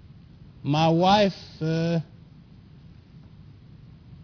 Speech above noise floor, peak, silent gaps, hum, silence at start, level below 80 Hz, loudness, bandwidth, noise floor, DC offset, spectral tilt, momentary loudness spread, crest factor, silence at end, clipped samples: 27 dB; -8 dBFS; none; none; 0.65 s; -54 dBFS; -23 LUFS; 5.4 kHz; -49 dBFS; under 0.1%; -6.5 dB/octave; 14 LU; 20 dB; 0 s; under 0.1%